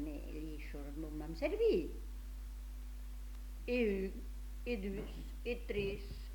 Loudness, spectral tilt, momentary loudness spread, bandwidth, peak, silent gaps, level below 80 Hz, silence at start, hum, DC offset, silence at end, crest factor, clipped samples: -41 LUFS; -6.5 dB/octave; 15 LU; 19 kHz; -24 dBFS; none; -46 dBFS; 0 s; none; under 0.1%; 0 s; 18 dB; under 0.1%